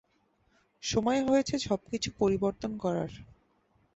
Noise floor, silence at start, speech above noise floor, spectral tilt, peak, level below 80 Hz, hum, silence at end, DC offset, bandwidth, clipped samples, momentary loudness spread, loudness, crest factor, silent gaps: -71 dBFS; 0.85 s; 41 dB; -5 dB/octave; -14 dBFS; -56 dBFS; none; 0.75 s; under 0.1%; 8.2 kHz; under 0.1%; 8 LU; -30 LUFS; 18 dB; none